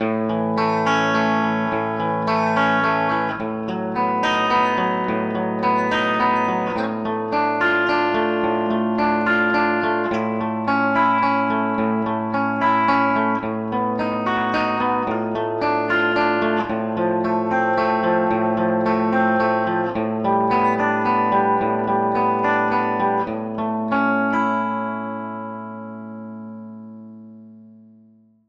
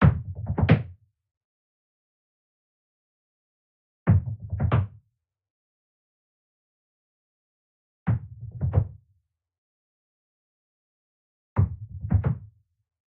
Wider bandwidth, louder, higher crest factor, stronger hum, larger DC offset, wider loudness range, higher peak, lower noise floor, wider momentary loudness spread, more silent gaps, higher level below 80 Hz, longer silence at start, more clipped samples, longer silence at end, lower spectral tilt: first, 7.4 kHz vs 4.5 kHz; first, -20 LUFS vs -27 LUFS; second, 14 dB vs 24 dB; neither; neither; second, 3 LU vs 6 LU; about the same, -6 dBFS vs -4 dBFS; second, -53 dBFS vs -76 dBFS; second, 7 LU vs 13 LU; second, none vs 1.37-4.06 s, 5.50-8.06 s, 9.58-11.56 s; second, -56 dBFS vs -42 dBFS; about the same, 0 s vs 0 s; neither; first, 0.75 s vs 0.6 s; second, -6.5 dB/octave vs -8.5 dB/octave